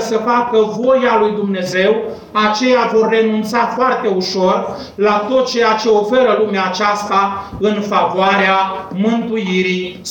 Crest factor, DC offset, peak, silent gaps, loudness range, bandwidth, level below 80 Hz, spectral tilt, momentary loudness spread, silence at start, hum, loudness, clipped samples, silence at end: 12 dB; under 0.1%; -4 dBFS; none; 1 LU; 17 kHz; -52 dBFS; -5 dB/octave; 6 LU; 0 s; none; -14 LUFS; under 0.1%; 0 s